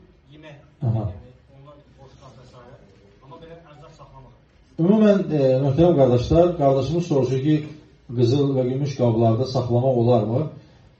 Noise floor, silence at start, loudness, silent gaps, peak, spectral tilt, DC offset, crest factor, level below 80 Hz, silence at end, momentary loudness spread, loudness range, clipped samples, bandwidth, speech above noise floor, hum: -50 dBFS; 0.45 s; -20 LUFS; none; -2 dBFS; -8.5 dB/octave; under 0.1%; 20 dB; -46 dBFS; 0.45 s; 10 LU; 15 LU; under 0.1%; 7.2 kHz; 31 dB; none